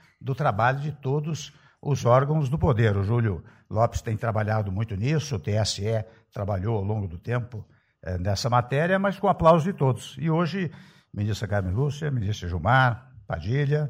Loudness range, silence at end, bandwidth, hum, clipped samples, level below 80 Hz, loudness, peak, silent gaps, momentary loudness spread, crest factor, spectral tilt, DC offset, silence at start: 4 LU; 0 s; 13 kHz; none; under 0.1%; -46 dBFS; -25 LUFS; -6 dBFS; none; 13 LU; 18 dB; -6.5 dB/octave; under 0.1%; 0.2 s